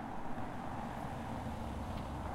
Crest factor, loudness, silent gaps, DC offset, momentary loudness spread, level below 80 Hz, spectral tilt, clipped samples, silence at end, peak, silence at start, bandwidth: 14 dB; -43 LUFS; none; under 0.1%; 2 LU; -50 dBFS; -6.5 dB/octave; under 0.1%; 0 s; -28 dBFS; 0 s; 16 kHz